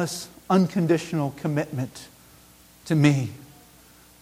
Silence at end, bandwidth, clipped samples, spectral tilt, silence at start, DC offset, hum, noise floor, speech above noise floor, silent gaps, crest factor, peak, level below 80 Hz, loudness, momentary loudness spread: 0.8 s; 16 kHz; under 0.1%; -6.5 dB/octave; 0 s; under 0.1%; 60 Hz at -55 dBFS; -52 dBFS; 29 dB; none; 20 dB; -6 dBFS; -60 dBFS; -24 LUFS; 16 LU